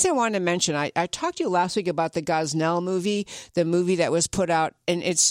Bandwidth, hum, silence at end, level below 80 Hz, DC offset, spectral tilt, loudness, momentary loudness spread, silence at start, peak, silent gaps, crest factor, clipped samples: 16 kHz; none; 0 s; -58 dBFS; under 0.1%; -3.5 dB/octave; -24 LUFS; 5 LU; 0 s; -6 dBFS; none; 16 dB; under 0.1%